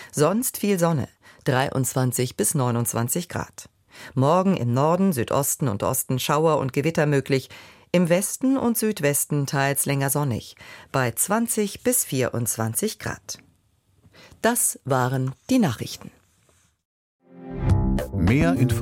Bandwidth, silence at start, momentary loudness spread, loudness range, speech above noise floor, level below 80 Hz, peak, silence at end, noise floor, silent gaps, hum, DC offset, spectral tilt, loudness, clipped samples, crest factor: 16.5 kHz; 0 s; 12 LU; 3 LU; 41 dB; -42 dBFS; -6 dBFS; 0 s; -63 dBFS; 16.85-17.19 s; none; under 0.1%; -5 dB/octave; -23 LUFS; under 0.1%; 18 dB